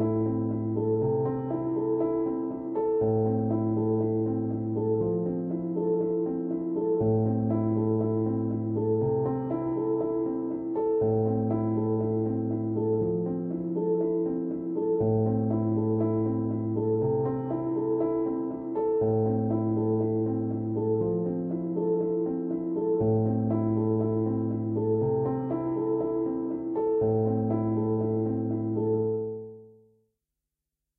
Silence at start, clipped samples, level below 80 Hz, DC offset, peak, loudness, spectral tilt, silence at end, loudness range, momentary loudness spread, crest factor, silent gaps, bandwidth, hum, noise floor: 0 s; under 0.1%; -58 dBFS; under 0.1%; -14 dBFS; -28 LUFS; -14.5 dB/octave; 1.3 s; 1 LU; 5 LU; 12 dB; none; 2.5 kHz; none; -87 dBFS